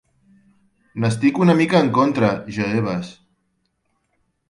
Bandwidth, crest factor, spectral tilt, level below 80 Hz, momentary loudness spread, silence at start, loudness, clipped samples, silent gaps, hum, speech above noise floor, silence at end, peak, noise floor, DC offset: 11.5 kHz; 18 dB; -7 dB/octave; -56 dBFS; 12 LU; 0.95 s; -18 LUFS; under 0.1%; none; none; 52 dB; 1.4 s; -2 dBFS; -70 dBFS; under 0.1%